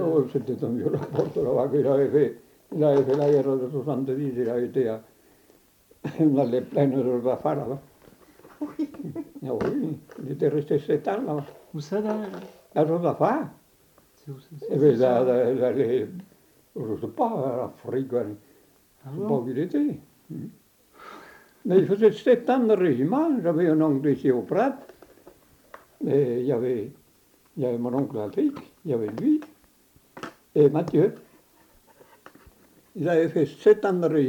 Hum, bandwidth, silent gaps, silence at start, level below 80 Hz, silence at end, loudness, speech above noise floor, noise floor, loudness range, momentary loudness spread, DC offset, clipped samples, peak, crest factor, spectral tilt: none; 19 kHz; none; 0 s; -66 dBFS; 0 s; -24 LUFS; 37 dB; -60 dBFS; 7 LU; 17 LU; under 0.1%; under 0.1%; -6 dBFS; 18 dB; -8.5 dB/octave